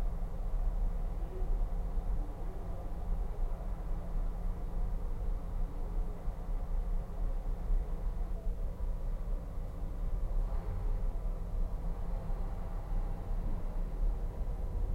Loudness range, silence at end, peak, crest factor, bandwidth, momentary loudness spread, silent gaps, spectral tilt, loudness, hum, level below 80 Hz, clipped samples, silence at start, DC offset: 1 LU; 0 s; -22 dBFS; 12 dB; 2.9 kHz; 3 LU; none; -8.5 dB/octave; -41 LUFS; none; -34 dBFS; under 0.1%; 0 s; under 0.1%